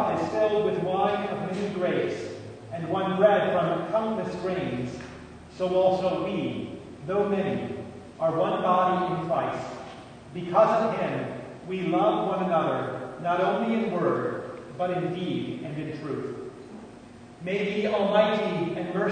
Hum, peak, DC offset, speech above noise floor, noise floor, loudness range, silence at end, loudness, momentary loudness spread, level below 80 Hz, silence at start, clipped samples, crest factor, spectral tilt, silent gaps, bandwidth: none; -8 dBFS; under 0.1%; 21 dB; -46 dBFS; 4 LU; 0 s; -27 LUFS; 16 LU; -60 dBFS; 0 s; under 0.1%; 20 dB; -7 dB/octave; none; 9.6 kHz